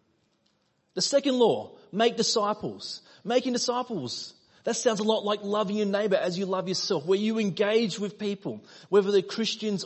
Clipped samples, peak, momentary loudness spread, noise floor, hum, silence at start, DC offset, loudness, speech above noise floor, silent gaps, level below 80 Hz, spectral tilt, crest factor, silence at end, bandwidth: under 0.1%; -10 dBFS; 12 LU; -71 dBFS; none; 0.95 s; under 0.1%; -27 LUFS; 44 dB; none; -74 dBFS; -4 dB/octave; 18 dB; 0 s; 8.6 kHz